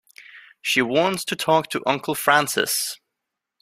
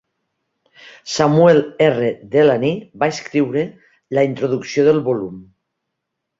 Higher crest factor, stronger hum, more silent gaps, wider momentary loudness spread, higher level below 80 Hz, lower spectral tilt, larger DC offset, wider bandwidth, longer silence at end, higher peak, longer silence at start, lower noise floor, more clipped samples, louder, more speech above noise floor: about the same, 22 dB vs 18 dB; neither; neither; second, 8 LU vs 11 LU; second, -66 dBFS vs -58 dBFS; second, -2.5 dB/octave vs -6 dB/octave; neither; first, 16 kHz vs 7.8 kHz; second, 0.65 s vs 0.95 s; about the same, -2 dBFS vs 0 dBFS; second, 0.2 s vs 0.85 s; first, -83 dBFS vs -78 dBFS; neither; second, -21 LUFS vs -17 LUFS; about the same, 61 dB vs 62 dB